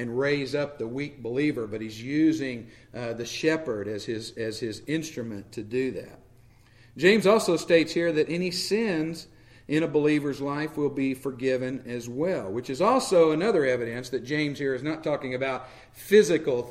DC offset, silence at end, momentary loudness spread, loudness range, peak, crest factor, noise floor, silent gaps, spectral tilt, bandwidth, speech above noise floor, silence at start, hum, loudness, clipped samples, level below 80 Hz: under 0.1%; 0 s; 13 LU; 6 LU; -6 dBFS; 20 dB; -55 dBFS; none; -5 dB/octave; 16 kHz; 29 dB; 0 s; none; -26 LUFS; under 0.1%; -60 dBFS